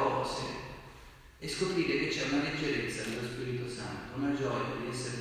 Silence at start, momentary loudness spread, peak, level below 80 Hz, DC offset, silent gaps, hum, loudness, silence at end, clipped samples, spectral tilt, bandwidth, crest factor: 0 s; 13 LU; -16 dBFS; -56 dBFS; under 0.1%; none; none; -34 LUFS; 0 s; under 0.1%; -4.5 dB/octave; 15.5 kHz; 18 dB